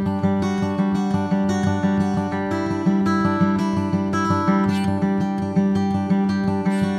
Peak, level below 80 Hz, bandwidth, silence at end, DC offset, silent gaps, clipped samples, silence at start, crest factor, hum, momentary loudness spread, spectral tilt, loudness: -6 dBFS; -52 dBFS; 10.5 kHz; 0 s; under 0.1%; none; under 0.1%; 0 s; 14 dB; none; 3 LU; -7.5 dB/octave; -21 LUFS